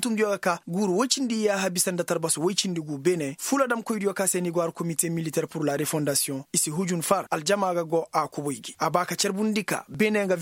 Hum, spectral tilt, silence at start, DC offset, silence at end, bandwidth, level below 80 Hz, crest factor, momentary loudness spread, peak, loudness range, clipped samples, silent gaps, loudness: none; -3.5 dB/octave; 0 s; under 0.1%; 0 s; 16.5 kHz; -70 dBFS; 20 dB; 4 LU; -6 dBFS; 1 LU; under 0.1%; none; -26 LUFS